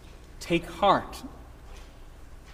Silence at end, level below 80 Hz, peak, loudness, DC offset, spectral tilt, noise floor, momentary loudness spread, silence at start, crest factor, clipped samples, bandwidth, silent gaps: 0 s; -46 dBFS; -8 dBFS; -26 LUFS; under 0.1%; -5 dB/octave; -46 dBFS; 25 LU; 0.15 s; 24 dB; under 0.1%; 15.5 kHz; none